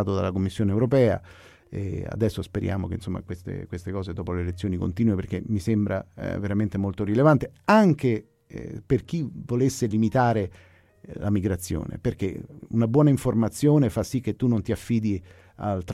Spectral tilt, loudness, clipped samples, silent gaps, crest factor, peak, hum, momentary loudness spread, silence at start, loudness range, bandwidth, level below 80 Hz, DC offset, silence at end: -7.5 dB/octave; -25 LUFS; under 0.1%; none; 18 dB; -6 dBFS; none; 13 LU; 0 s; 6 LU; 14.5 kHz; -48 dBFS; under 0.1%; 0 s